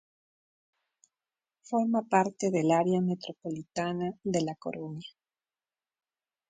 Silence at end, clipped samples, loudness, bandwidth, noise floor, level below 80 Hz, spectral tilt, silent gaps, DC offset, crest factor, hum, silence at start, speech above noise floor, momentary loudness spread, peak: 1.4 s; under 0.1%; -30 LUFS; 9.4 kHz; under -90 dBFS; -72 dBFS; -6 dB/octave; none; under 0.1%; 22 dB; none; 1.7 s; over 61 dB; 13 LU; -10 dBFS